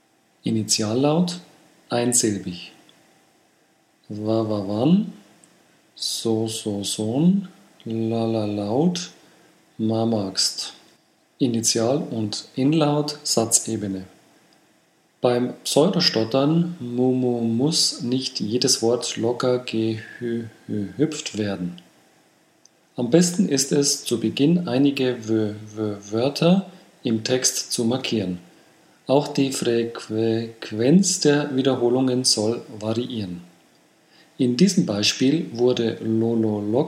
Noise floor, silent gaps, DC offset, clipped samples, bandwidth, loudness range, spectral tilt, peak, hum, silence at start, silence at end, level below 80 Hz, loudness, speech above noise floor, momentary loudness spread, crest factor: -61 dBFS; none; under 0.1%; under 0.1%; 16 kHz; 5 LU; -4.5 dB/octave; 0 dBFS; none; 0.45 s; 0 s; -70 dBFS; -22 LUFS; 40 dB; 11 LU; 22 dB